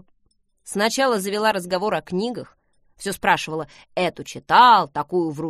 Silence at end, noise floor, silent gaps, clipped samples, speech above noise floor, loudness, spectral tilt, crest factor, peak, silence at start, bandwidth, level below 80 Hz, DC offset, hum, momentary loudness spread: 0 s; -65 dBFS; none; under 0.1%; 45 dB; -20 LUFS; -3.5 dB/octave; 18 dB; -2 dBFS; 0.65 s; 15 kHz; -58 dBFS; under 0.1%; none; 17 LU